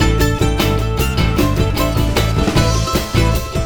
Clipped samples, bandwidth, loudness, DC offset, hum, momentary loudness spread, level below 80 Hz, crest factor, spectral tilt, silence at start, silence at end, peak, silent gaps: under 0.1%; over 20 kHz; -16 LUFS; under 0.1%; none; 2 LU; -20 dBFS; 14 dB; -5.5 dB/octave; 0 s; 0 s; 0 dBFS; none